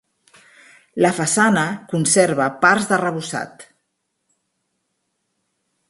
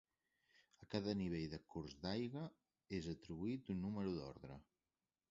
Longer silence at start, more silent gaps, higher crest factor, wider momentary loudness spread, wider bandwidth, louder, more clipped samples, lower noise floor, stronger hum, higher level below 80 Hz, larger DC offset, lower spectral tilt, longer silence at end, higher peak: first, 0.95 s vs 0.8 s; neither; about the same, 20 dB vs 22 dB; about the same, 12 LU vs 11 LU; first, 11.5 kHz vs 7.6 kHz; first, -18 LUFS vs -47 LUFS; neither; second, -74 dBFS vs under -90 dBFS; neither; about the same, -64 dBFS vs -68 dBFS; neither; second, -4 dB/octave vs -6.5 dB/octave; first, 2.25 s vs 0.7 s; first, 0 dBFS vs -26 dBFS